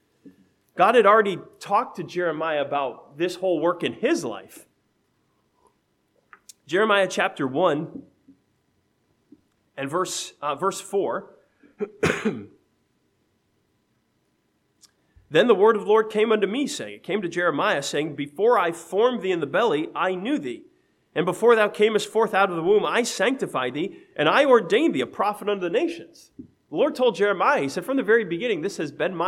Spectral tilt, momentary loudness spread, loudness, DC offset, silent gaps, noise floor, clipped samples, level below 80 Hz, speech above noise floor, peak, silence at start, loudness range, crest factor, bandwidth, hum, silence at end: -4.5 dB/octave; 12 LU; -23 LUFS; under 0.1%; none; -69 dBFS; under 0.1%; -68 dBFS; 47 dB; -4 dBFS; 0.25 s; 8 LU; 20 dB; 14.5 kHz; none; 0 s